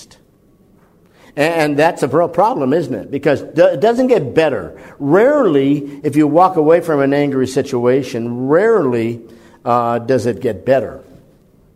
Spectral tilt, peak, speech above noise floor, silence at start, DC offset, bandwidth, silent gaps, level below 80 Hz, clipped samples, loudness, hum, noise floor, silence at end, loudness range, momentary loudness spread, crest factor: -6.5 dB/octave; 0 dBFS; 37 dB; 0 s; under 0.1%; 14.5 kHz; none; -52 dBFS; under 0.1%; -14 LUFS; none; -51 dBFS; 0.75 s; 3 LU; 10 LU; 14 dB